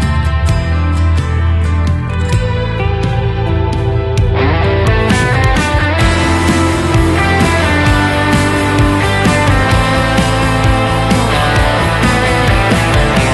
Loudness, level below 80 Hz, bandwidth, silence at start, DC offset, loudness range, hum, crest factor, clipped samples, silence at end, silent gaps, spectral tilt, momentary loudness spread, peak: -12 LUFS; -18 dBFS; 12.5 kHz; 0 s; under 0.1%; 3 LU; none; 10 dB; under 0.1%; 0 s; none; -5.5 dB/octave; 4 LU; 0 dBFS